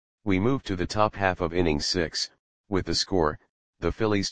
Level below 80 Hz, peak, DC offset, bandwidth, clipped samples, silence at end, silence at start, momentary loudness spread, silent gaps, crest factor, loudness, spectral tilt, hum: -44 dBFS; -4 dBFS; 0.8%; 10 kHz; under 0.1%; 0 s; 0.2 s; 7 LU; 2.39-2.64 s, 3.49-3.73 s; 22 dB; -26 LUFS; -4.5 dB/octave; none